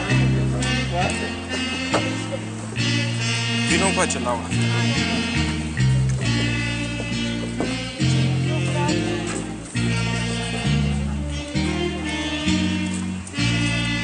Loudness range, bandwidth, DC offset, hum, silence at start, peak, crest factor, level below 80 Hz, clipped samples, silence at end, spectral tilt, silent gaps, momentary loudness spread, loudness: 3 LU; 10.5 kHz; under 0.1%; none; 0 s; -4 dBFS; 18 dB; -36 dBFS; under 0.1%; 0 s; -4.5 dB/octave; none; 6 LU; -22 LUFS